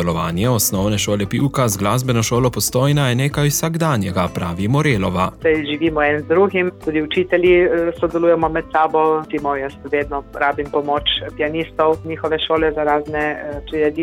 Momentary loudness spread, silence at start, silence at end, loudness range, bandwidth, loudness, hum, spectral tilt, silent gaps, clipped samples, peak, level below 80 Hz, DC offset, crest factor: 6 LU; 0 s; 0 s; 3 LU; 19.5 kHz; -18 LUFS; none; -5 dB/octave; none; under 0.1%; -4 dBFS; -40 dBFS; under 0.1%; 14 dB